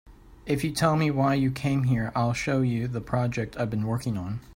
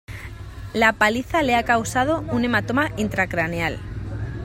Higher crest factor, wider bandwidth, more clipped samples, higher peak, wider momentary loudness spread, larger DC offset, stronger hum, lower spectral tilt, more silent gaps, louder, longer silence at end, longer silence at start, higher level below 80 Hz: about the same, 18 dB vs 20 dB; about the same, 16 kHz vs 16 kHz; neither; second, -8 dBFS vs -2 dBFS; second, 6 LU vs 13 LU; neither; neither; first, -6.5 dB/octave vs -5 dB/octave; neither; second, -26 LUFS vs -21 LUFS; about the same, 0 s vs 0 s; about the same, 0.05 s vs 0.1 s; second, -50 dBFS vs -40 dBFS